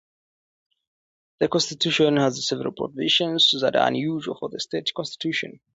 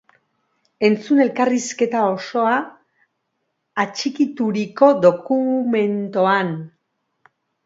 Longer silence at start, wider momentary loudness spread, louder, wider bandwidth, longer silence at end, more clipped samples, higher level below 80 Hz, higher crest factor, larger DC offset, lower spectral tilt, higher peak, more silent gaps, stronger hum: first, 1.4 s vs 0.8 s; first, 11 LU vs 8 LU; second, -22 LUFS vs -19 LUFS; about the same, 8 kHz vs 7.8 kHz; second, 0.25 s vs 1 s; neither; about the same, -66 dBFS vs -70 dBFS; about the same, 18 dB vs 20 dB; neither; second, -4 dB/octave vs -5.5 dB/octave; second, -6 dBFS vs 0 dBFS; neither; neither